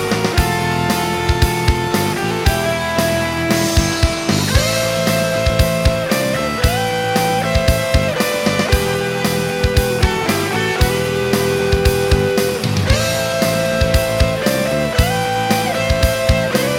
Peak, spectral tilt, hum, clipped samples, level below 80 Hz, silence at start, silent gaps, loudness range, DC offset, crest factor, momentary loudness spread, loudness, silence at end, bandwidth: 0 dBFS; -4.5 dB/octave; none; under 0.1%; -24 dBFS; 0 s; none; 1 LU; under 0.1%; 16 dB; 2 LU; -16 LUFS; 0 s; over 20 kHz